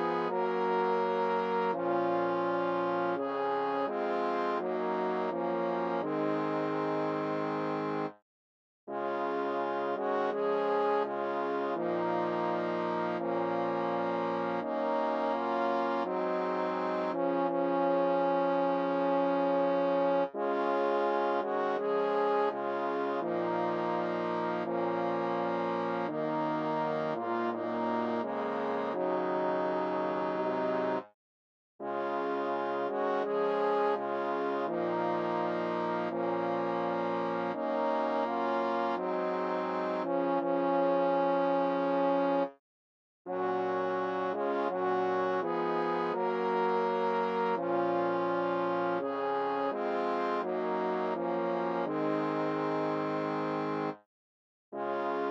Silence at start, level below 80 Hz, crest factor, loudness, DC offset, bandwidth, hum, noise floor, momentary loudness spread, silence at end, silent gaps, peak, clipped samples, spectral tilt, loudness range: 0 s; -88 dBFS; 14 dB; -31 LUFS; under 0.1%; 7 kHz; none; under -90 dBFS; 4 LU; 0 s; 8.22-8.87 s, 31.14-31.79 s, 42.59-43.25 s, 54.06-54.72 s; -16 dBFS; under 0.1%; -7.5 dB/octave; 3 LU